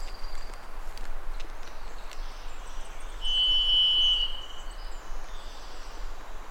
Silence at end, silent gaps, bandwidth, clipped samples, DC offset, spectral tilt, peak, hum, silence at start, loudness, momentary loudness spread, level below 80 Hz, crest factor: 0 s; none; 9.8 kHz; under 0.1%; under 0.1%; -1.5 dB/octave; -14 dBFS; none; 0 s; -22 LUFS; 24 LU; -36 dBFS; 14 dB